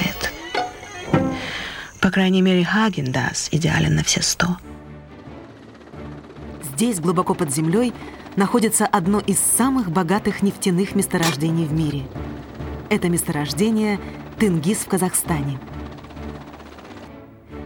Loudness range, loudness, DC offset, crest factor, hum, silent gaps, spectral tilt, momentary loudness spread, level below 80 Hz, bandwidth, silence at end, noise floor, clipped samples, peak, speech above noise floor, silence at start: 5 LU; -20 LUFS; under 0.1%; 20 dB; none; none; -4.5 dB/octave; 21 LU; -42 dBFS; 19.5 kHz; 0 s; -42 dBFS; under 0.1%; -2 dBFS; 22 dB; 0 s